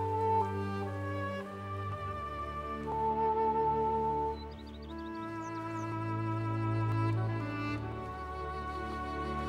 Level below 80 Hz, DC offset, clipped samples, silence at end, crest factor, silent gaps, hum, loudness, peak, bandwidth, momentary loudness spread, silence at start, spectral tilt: -52 dBFS; under 0.1%; under 0.1%; 0 s; 14 dB; none; none; -35 LUFS; -20 dBFS; 10 kHz; 10 LU; 0 s; -8 dB/octave